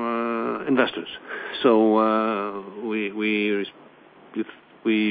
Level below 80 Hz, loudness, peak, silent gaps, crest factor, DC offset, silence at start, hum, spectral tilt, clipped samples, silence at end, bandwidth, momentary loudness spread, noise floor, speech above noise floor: -70 dBFS; -24 LUFS; -6 dBFS; none; 18 dB; under 0.1%; 0 s; none; -9 dB/octave; under 0.1%; 0 s; 4.9 kHz; 15 LU; -49 dBFS; 26 dB